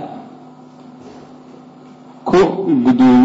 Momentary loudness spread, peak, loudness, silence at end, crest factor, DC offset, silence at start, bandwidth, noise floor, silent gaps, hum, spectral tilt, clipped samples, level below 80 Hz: 27 LU; -4 dBFS; -14 LUFS; 0 s; 12 dB; under 0.1%; 0 s; 7.8 kHz; -40 dBFS; none; none; -7.5 dB/octave; under 0.1%; -50 dBFS